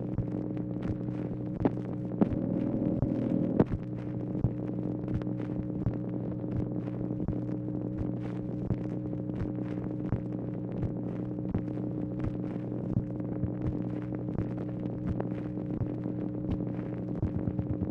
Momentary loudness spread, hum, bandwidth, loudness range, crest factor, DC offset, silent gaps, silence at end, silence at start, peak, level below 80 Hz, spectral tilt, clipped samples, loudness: 5 LU; none; 4.3 kHz; 4 LU; 22 dB; under 0.1%; none; 0 s; 0 s; -12 dBFS; -48 dBFS; -11.5 dB/octave; under 0.1%; -34 LUFS